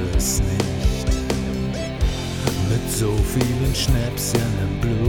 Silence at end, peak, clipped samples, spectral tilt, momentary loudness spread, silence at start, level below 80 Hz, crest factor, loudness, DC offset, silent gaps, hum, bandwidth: 0 s; -6 dBFS; under 0.1%; -5 dB/octave; 4 LU; 0 s; -26 dBFS; 14 dB; -22 LUFS; under 0.1%; none; none; 19 kHz